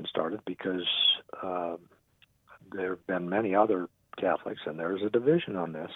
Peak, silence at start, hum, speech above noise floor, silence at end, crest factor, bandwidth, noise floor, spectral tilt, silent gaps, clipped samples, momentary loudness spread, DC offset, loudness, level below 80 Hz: -10 dBFS; 0 s; none; 37 dB; 0 s; 20 dB; 4.1 kHz; -66 dBFS; -7.5 dB/octave; none; under 0.1%; 12 LU; under 0.1%; -29 LUFS; -72 dBFS